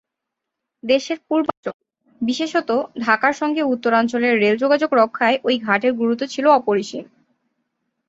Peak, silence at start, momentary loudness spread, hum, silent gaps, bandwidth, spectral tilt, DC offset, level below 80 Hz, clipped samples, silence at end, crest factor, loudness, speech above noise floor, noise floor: -2 dBFS; 0.85 s; 9 LU; none; 1.57-1.63 s, 1.74-1.79 s; 8 kHz; -4.5 dB/octave; under 0.1%; -66 dBFS; under 0.1%; 1.05 s; 18 dB; -19 LUFS; 63 dB; -82 dBFS